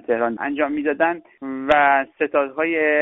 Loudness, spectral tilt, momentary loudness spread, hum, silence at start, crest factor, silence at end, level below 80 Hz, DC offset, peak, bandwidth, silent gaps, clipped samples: -20 LUFS; 2 dB/octave; 9 LU; none; 0.1 s; 16 dB; 0 s; -56 dBFS; under 0.1%; -4 dBFS; 3.9 kHz; none; under 0.1%